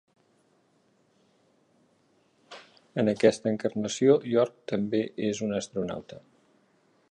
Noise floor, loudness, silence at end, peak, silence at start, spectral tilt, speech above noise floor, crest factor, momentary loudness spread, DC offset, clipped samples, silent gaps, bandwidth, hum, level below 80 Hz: -67 dBFS; -27 LUFS; 0.95 s; -6 dBFS; 2.5 s; -5.5 dB/octave; 41 dB; 24 dB; 25 LU; under 0.1%; under 0.1%; none; 11 kHz; none; -68 dBFS